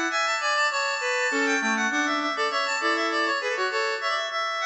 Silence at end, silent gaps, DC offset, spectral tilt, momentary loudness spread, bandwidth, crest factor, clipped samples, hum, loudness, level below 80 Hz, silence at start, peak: 0 s; none; under 0.1%; -1 dB/octave; 3 LU; 8.4 kHz; 12 dB; under 0.1%; none; -24 LUFS; -78 dBFS; 0 s; -12 dBFS